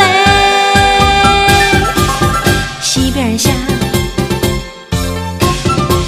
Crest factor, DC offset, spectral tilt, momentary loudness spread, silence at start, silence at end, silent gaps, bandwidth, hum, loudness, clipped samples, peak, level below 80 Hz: 12 dB; under 0.1%; -4 dB/octave; 9 LU; 0 s; 0 s; none; 16 kHz; none; -11 LUFS; 0.2%; 0 dBFS; -24 dBFS